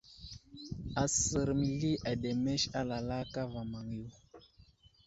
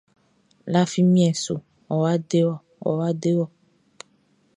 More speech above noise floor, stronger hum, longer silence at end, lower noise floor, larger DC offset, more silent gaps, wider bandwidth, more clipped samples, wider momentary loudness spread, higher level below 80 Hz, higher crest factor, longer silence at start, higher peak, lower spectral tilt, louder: second, 29 dB vs 42 dB; neither; second, 0.65 s vs 1.1 s; about the same, -63 dBFS vs -63 dBFS; neither; neither; second, 8.2 kHz vs 10.5 kHz; neither; first, 19 LU vs 12 LU; first, -54 dBFS vs -66 dBFS; about the same, 18 dB vs 18 dB; second, 0.1 s vs 0.65 s; second, -18 dBFS vs -6 dBFS; second, -4.5 dB/octave vs -6.5 dB/octave; second, -35 LUFS vs -22 LUFS